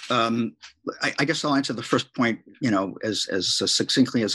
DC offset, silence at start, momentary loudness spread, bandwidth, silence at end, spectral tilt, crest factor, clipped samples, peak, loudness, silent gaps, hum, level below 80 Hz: under 0.1%; 0 s; 7 LU; 12.5 kHz; 0 s; -3.5 dB/octave; 20 dB; under 0.1%; -4 dBFS; -24 LUFS; none; none; -68 dBFS